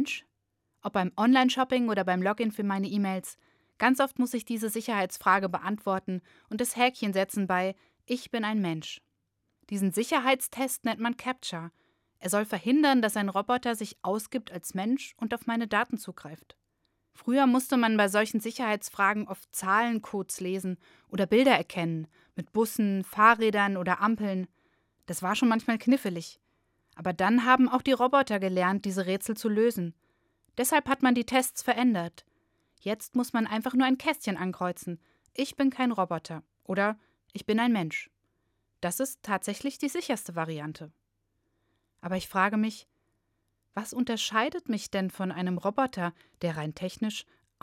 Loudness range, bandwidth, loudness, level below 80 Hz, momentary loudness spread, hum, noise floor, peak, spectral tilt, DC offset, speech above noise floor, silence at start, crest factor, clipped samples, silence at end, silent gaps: 6 LU; 17 kHz; -28 LUFS; -70 dBFS; 14 LU; none; -79 dBFS; -6 dBFS; -4.5 dB/octave; under 0.1%; 51 dB; 0 s; 22 dB; under 0.1%; 0.4 s; none